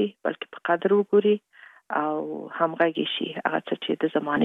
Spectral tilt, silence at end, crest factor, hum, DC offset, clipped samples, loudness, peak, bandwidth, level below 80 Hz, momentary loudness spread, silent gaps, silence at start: -7.5 dB/octave; 0 s; 18 dB; none; under 0.1%; under 0.1%; -25 LUFS; -6 dBFS; 4 kHz; -74 dBFS; 10 LU; none; 0 s